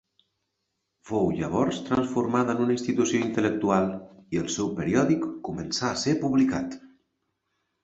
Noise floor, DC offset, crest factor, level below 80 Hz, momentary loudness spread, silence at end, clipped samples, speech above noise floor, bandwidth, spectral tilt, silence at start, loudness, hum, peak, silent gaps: -79 dBFS; under 0.1%; 18 dB; -56 dBFS; 9 LU; 0.95 s; under 0.1%; 54 dB; 8.2 kHz; -5.5 dB/octave; 1.05 s; -26 LUFS; none; -8 dBFS; none